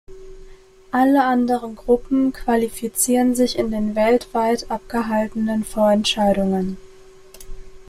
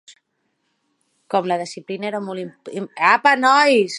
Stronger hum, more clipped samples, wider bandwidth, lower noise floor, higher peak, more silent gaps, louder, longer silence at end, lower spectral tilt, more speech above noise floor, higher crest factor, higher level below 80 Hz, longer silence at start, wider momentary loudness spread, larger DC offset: neither; neither; first, 15.5 kHz vs 11.5 kHz; second, -44 dBFS vs -71 dBFS; second, -4 dBFS vs 0 dBFS; neither; about the same, -19 LUFS vs -18 LUFS; about the same, 0.05 s vs 0 s; about the same, -4.5 dB/octave vs -4 dB/octave; second, 25 dB vs 53 dB; about the same, 16 dB vs 20 dB; first, -42 dBFS vs -74 dBFS; about the same, 0.1 s vs 0.1 s; second, 7 LU vs 17 LU; neither